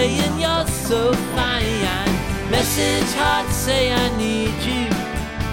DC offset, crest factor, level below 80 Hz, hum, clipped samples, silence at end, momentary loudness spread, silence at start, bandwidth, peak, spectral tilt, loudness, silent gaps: under 0.1%; 14 dB; -32 dBFS; none; under 0.1%; 0 s; 4 LU; 0 s; 17 kHz; -6 dBFS; -4 dB/octave; -20 LUFS; none